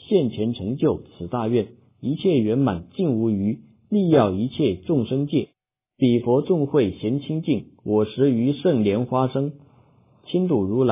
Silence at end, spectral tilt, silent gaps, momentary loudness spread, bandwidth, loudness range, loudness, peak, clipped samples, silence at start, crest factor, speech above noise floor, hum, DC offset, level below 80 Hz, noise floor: 0 s; -12 dB/octave; none; 7 LU; 3.9 kHz; 2 LU; -22 LUFS; -2 dBFS; under 0.1%; 0.1 s; 20 dB; 35 dB; none; under 0.1%; -50 dBFS; -56 dBFS